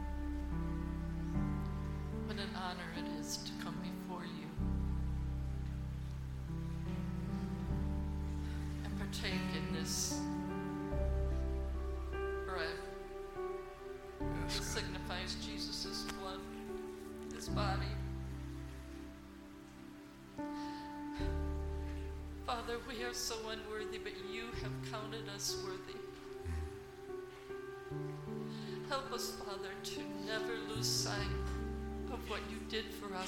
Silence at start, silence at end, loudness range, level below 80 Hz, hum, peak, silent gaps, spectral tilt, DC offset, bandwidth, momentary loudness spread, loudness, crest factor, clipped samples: 0 s; 0 s; 5 LU; -46 dBFS; none; -24 dBFS; none; -4.5 dB/octave; under 0.1%; 16 kHz; 10 LU; -42 LUFS; 18 dB; under 0.1%